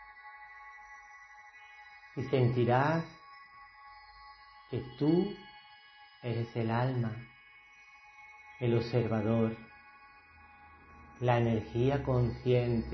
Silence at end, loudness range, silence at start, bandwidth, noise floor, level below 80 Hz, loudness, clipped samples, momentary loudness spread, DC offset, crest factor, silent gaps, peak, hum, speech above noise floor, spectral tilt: 0 s; 4 LU; 0 s; 6.2 kHz; -58 dBFS; -56 dBFS; -32 LUFS; under 0.1%; 24 LU; under 0.1%; 20 dB; none; -14 dBFS; none; 27 dB; -9 dB/octave